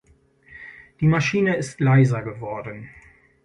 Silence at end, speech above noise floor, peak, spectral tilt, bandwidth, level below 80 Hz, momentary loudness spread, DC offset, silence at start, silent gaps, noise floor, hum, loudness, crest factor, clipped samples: 0.55 s; 36 dB; -6 dBFS; -7 dB/octave; 11 kHz; -52 dBFS; 23 LU; under 0.1%; 0.5 s; none; -56 dBFS; none; -21 LUFS; 16 dB; under 0.1%